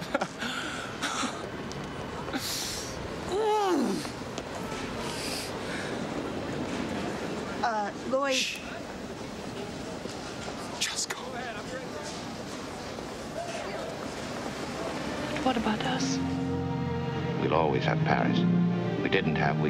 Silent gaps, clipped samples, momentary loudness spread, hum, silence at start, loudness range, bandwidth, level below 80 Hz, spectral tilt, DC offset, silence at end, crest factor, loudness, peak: none; under 0.1%; 11 LU; none; 0 s; 7 LU; 16 kHz; -54 dBFS; -4.5 dB/octave; under 0.1%; 0 s; 20 dB; -31 LUFS; -10 dBFS